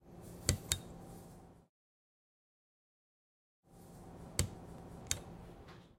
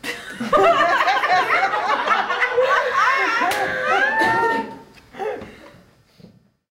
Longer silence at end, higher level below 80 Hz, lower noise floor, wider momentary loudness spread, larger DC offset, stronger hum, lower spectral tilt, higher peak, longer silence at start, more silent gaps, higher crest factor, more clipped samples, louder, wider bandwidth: second, 0 s vs 0.45 s; about the same, -56 dBFS vs -56 dBFS; first, under -90 dBFS vs -51 dBFS; first, 20 LU vs 13 LU; neither; neither; about the same, -3 dB/octave vs -3 dB/octave; second, -10 dBFS vs -4 dBFS; about the same, 0 s vs 0.05 s; first, 1.69-3.63 s vs none; first, 36 dB vs 16 dB; neither; second, -40 LUFS vs -18 LUFS; about the same, 16.5 kHz vs 16 kHz